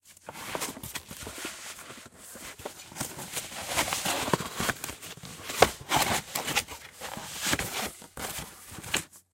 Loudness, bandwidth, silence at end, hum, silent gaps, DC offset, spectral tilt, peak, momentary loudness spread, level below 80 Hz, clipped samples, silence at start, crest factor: -31 LUFS; 16.5 kHz; 0.15 s; none; none; under 0.1%; -2 dB/octave; -2 dBFS; 16 LU; -54 dBFS; under 0.1%; 0.05 s; 32 dB